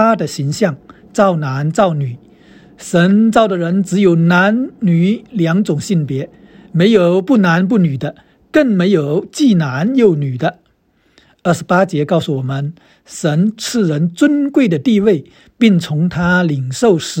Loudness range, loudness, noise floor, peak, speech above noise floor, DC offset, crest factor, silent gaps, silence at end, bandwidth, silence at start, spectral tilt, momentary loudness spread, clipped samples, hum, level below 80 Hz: 3 LU; -14 LUFS; -57 dBFS; 0 dBFS; 44 dB; under 0.1%; 14 dB; none; 0 s; 16 kHz; 0 s; -6.5 dB/octave; 10 LU; under 0.1%; none; -50 dBFS